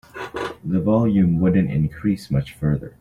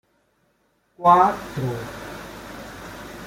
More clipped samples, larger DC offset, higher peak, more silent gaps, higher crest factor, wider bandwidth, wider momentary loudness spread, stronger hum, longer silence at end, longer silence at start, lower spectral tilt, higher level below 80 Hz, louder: neither; neither; second, -6 dBFS vs -2 dBFS; neither; second, 14 dB vs 22 dB; second, 12 kHz vs 16.5 kHz; second, 12 LU vs 22 LU; neither; about the same, 0.1 s vs 0 s; second, 0.15 s vs 1 s; first, -9 dB/octave vs -6 dB/octave; first, -42 dBFS vs -52 dBFS; about the same, -21 LUFS vs -20 LUFS